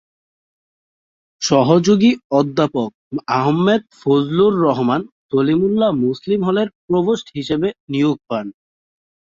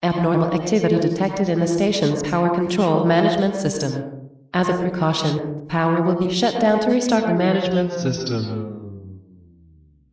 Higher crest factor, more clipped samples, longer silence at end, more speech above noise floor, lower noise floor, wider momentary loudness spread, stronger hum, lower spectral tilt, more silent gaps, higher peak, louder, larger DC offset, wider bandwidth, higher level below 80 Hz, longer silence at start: about the same, 16 dB vs 14 dB; neither; about the same, 0.9 s vs 0.9 s; first, over 74 dB vs 33 dB; first, under -90 dBFS vs -52 dBFS; about the same, 10 LU vs 9 LU; neither; about the same, -6 dB/octave vs -6 dB/octave; first, 2.24-2.30 s, 2.94-3.11 s, 5.12-5.29 s, 6.75-6.88 s, 7.80-7.87 s vs none; first, -2 dBFS vs -6 dBFS; first, -17 LUFS vs -20 LUFS; neither; about the same, 7.6 kHz vs 8 kHz; about the same, -56 dBFS vs -52 dBFS; first, 1.4 s vs 0 s